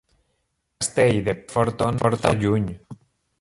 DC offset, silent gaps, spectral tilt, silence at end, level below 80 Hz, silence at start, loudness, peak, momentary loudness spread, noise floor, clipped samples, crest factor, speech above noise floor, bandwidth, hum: under 0.1%; none; -5.5 dB/octave; 0.45 s; -46 dBFS; 0.8 s; -22 LUFS; -4 dBFS; 8 LU; -73 dBFS; under 0.1%; 20 dB; 52 dB; 11.5 kHz; none